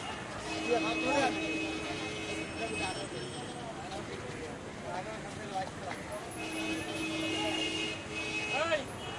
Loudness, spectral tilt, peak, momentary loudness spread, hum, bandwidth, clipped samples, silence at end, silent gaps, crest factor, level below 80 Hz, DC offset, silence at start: -35 LUFS; -3.5 dB/octave; -18 dBFS; 10 LU; none; 11.5 kHz; under 0.1%; 0 s; none; 18 dB; -60 dBFS; under 0.1%; 0 s